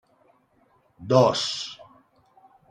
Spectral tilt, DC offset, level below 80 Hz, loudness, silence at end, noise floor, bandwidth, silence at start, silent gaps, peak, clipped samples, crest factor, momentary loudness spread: -5 dB/octave; under 0.1%; -66 dBFS; -23 LUFS; 0.95 s; -64 dBFS; 10.5 kHz; 1 s; none; -4 dBFS; under 0.1%; 22 dB; 25 LU